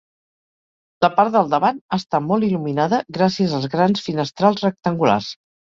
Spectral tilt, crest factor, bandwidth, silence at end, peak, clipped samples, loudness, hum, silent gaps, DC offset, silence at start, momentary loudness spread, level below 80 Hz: -6.5 dB/octave; 18 dB; 7.6 kHz; 0.35 s; -2 dBFS; under 0.1%; -19 LUFS; none; 1.81-1.89 s; under 0.1%; 1 s; 5 LU; -60 dBFS